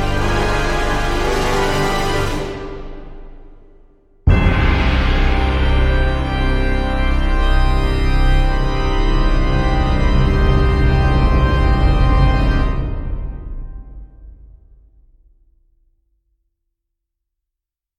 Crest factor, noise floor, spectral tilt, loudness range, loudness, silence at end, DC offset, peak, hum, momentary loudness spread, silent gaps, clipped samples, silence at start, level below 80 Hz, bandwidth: 14 dB; -83 dBFS; -6.5 dB/octave; 6 LU; -17 LUFS; 3.7 s; under 0.1%; -2 dBFS; none; 12 LU; none; under 0.1%; 0 s; -18 dBFS; 11.5 kHz